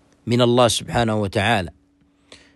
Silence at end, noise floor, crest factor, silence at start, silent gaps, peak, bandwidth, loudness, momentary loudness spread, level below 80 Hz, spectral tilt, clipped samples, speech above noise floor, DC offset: 0.2 s; -59 dBFS; 18 dB; 0.25 s; none; -4 dBFS; 12.5 kHz; -19 LUFS; 8 LU; -46 dBFS; -5 dB/octave; under 0.1%; 41 dB; under 0.1%